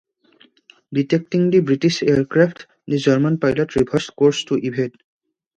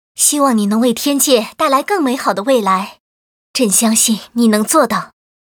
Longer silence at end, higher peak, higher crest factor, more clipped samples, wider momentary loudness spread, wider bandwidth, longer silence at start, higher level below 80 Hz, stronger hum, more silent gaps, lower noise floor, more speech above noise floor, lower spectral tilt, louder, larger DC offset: first, 0.65 s vs 0.45 s; about the same, -2 dBFS vs 0 dBFS; about the same, 18 dB vs 14 dB; neither; about the same, 8 LU vs 6 LU; second, 9.6 kHz vs over 20 kHz; first, 0.9 s vs 0.2 s; first, -52 dBFS vs -62 dBFS; neither; second, none vs 3.00-3.54 s; second, -55 dBFS vs under -90 dBFS; second, 37 dB vs over 76 dB; first, -6.5 dB/octave vs -3 dB/octave; second, -19 LUFS vs -13 LUFS; neither